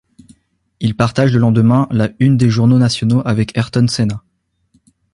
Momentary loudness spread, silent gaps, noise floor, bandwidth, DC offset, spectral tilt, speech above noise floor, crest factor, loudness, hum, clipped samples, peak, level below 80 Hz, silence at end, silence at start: 7 LU; none; -60 dBFS; 11 kHz; under 0.1%; -7 dB/octave; 47 dB; 14 dB; -14 LUFS; none; under 0.1%; 0 dBFS; -44 dBFS; 0.95 s; 0.8 s